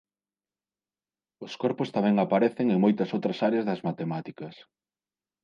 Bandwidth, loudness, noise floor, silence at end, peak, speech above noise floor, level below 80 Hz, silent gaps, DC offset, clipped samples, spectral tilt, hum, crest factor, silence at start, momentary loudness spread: 7 kHz; -26 LUFS; under -90 dBFS; 0.9 s; -10 dBFS; over 64 dB; -76 dBFS; none; under 0.1%; under 0.1%; -8 dB/octave; none; 18 dB; 1.4 s; 18 LU